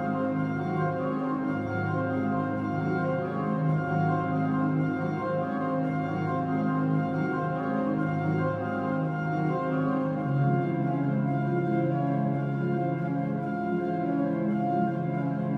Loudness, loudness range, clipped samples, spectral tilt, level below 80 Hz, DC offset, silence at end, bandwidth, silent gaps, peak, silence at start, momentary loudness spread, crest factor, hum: -28 LUFS; 1 LU; under 0.1%; -10 dB/octave; -64 dBFS; under 0.1%; 0 s; 6 kHz; none; -14 dBFS; 0 s; 3 LU; 12 dB; none